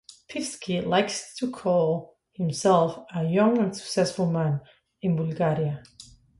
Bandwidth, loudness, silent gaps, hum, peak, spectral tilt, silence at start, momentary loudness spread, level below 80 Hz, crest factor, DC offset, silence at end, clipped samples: 11.5 kHz; -26 LUFS; none; none; -8 dBFS; -6 dB/octave; 0.3 s; 11 LU; -62 dBFS; 18 dB; under 0.1%; 0.35 s; under 0.1%